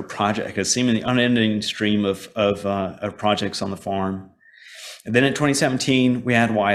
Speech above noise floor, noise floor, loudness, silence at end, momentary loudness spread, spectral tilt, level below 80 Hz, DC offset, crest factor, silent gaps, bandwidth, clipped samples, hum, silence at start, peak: 24 dB; -45 dBFS; -21 LUFS; 0 s; 9 LU; -4.5 dB/octave; -56 dBFS; under 0.1%; 18 dB; none; 14 kHz; under 0.1%; none; 0 s; -2 dBFS